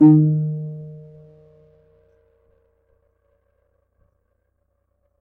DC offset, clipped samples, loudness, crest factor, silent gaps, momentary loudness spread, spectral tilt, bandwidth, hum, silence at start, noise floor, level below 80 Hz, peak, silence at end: under 0.1%; under 0.1%; -19 LUFS; 20 dB; none; 28 LU; -14 dB/octave; 2 kHz; none; 0 s; -70 dBFS; -64 dBFS; -4 dBFS; 4.2 s